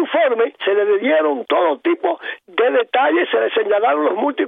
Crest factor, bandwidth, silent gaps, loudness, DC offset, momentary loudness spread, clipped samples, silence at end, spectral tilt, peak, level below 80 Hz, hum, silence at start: 14 dB; 3.9 kHz; none; -17 LUFS; under 0.1%; 3 LU; under 0.1%; 0 s; -6.5 dB/octave; -4 dBFS; -82 dBFS; none; 0 s